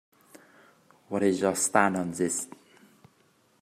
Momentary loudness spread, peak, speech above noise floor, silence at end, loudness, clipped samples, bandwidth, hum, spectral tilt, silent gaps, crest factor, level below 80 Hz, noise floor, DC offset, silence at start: 10 LU; -4 dBFS; 39 dB; 1.15 s; -26 LUFS; under 0.1%; 15.5 kHz; none; -4 dB/octave; none; 26 dB; -72 dBFS; -65 dBFS; under 0.1%; 1.1 s